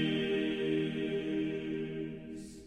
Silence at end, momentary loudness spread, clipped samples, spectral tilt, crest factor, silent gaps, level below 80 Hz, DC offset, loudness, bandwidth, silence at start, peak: 0 s; 10 LU; under 0.1%; -6.5 dB/octave; 14 dB; none; -62 dBFS; under 0.1%; -35 LUFS; 10.5 kHz; 0 s; -20 dBFS